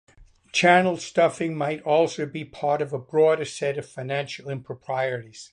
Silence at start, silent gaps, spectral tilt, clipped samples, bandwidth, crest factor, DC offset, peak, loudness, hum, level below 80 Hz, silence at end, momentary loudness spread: 0.2 s; none; -5 dB/octave; under 0.1%; 10.5 kHz; 20 dB; under 0.1%; -4 dBFS; -24 LUFS; none; -64 dBFS; 0.05 s; 14 LU